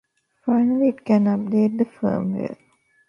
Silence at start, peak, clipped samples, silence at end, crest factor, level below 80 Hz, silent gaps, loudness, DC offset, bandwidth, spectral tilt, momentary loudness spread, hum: 0.45 s; -6 dBFS; under 0.1%; 0.55 s; 16 dB; -64 dBFS; none; -21 LUFS; under 0.1%; 5.8 kHz; -10 dB/octave; 9 LU; none